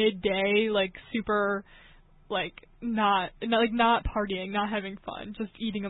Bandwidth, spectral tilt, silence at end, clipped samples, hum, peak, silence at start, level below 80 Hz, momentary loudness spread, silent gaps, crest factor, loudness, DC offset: 4.1 kHz; -9 dB/octave; 0 s; under 0.1%; none; -10 dBFS; 0 s; -48 dBFS; 12 LU; none; 18 dB; -28 LUFS; under 0.1%